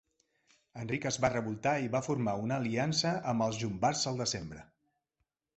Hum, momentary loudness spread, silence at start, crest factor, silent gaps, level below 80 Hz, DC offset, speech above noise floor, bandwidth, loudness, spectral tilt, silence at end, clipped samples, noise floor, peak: none; 9 LU; 0.75 s; 22 dB; none; -62 dBFS; under 0.1%; 51 dB; 8.2 kHz; -33 LUFS; -4.5 dB/octave; 0.95 s; under 0.1%; -84 dBFS; -12 dBFS